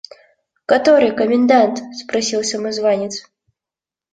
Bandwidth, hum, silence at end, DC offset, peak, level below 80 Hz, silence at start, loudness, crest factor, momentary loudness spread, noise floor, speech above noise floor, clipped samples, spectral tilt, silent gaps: 9.4 kHz; none; 0.95 s; under 0.1%; -2 dBFS; -62 dBFS; 0.7 s; -16 LUFS; 16 dB; 14 LU; -89 dBFS; 73 dB; under 0.1%; -3.5 dB/octave; none